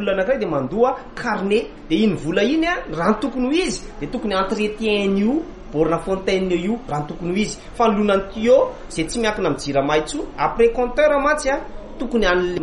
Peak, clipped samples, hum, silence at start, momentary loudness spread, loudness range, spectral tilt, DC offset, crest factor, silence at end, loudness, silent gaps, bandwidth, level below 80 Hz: -4 dBFS; under 0.1%; none; 0 s; 9 LU; 2 LU; -5 dB/octave; under 0.1%; 16 dB; 0 s; -20 LUFS; none; 11.5 kHz; -38 dBFS